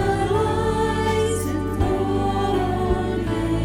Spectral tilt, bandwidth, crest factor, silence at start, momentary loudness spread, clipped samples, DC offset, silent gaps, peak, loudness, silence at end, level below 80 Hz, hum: -6.5 dB/octave; 16.5 kHz; 12 dB; 0 s; 3 LU; under 0.1%; under 0.1%; none; -8 dBFS; -22 LUFS; 0 s; -32 dBFS; none